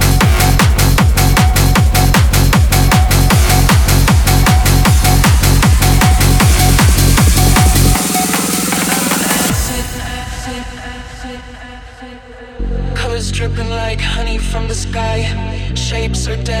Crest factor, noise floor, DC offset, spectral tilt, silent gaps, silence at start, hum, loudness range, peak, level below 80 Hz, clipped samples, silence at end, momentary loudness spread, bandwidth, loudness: 12 dB; -32 dBFS; under 0.1%; -4 dB/octave; none; 0 s; none; 12 LU; 0 dBFS; -16 dBFS; under 0.1%; 0 s; 14 LU; 19.5 kHz; -12 LUFS